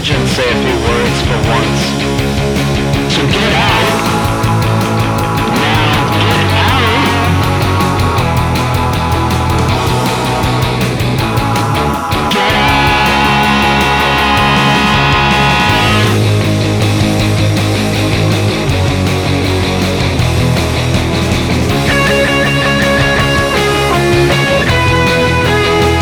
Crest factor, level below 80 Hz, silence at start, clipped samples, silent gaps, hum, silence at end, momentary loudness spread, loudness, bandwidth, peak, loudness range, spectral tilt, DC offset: 10 dB; -24 dBFS; 0 s; under 0.1%; none; none; 0 s; 4 LU; -11 LUFS; over 20 kHz; 0 dBFS; 3 LU; -5 dB/octave; under 0.1%